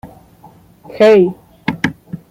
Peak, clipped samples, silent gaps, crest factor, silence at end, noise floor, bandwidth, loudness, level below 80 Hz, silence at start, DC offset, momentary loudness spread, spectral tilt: -2 dBFS; under 0.1%; none; 14 dB; 0.15 s; -44 dBFS; 15 kHz; -13 LUFS; -52 dBFS; 0.05 s; under 0.1%; 15 LU; -6.5 dB/octave